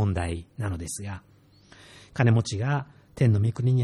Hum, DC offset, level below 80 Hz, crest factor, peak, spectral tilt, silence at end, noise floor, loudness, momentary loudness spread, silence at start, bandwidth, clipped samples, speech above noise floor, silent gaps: none; under 0.1%; -48 dBFS; 16 dB; -8 dBFS; -6.5 dB/octave; 0 s; -54 dBFS; -26 LUFS; 16 LU; 0 s; 12.5 kHz; under 0.1%; 29 dB; none